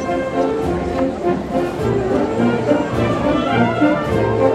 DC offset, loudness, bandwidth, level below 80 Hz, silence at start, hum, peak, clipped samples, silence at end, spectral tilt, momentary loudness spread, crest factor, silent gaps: under 0.1%; -18 LUFS; 13.5 kHz; -38 dBFS; 0 s; none; -2 dBFS; under 0.1%; 0 s; -7.5 dB/octave; 4 LU; 16 dB; none